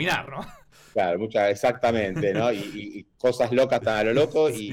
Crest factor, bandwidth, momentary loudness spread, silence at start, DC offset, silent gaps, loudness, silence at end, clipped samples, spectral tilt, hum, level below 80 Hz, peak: 12 dB; 16.5 kHz; 15 LU; 0 s; under 0.1%; none; -24 LUFS; 0 s; under 0.1%; -5.5 dB/octave; none; -56 dBFS; -12 dBFS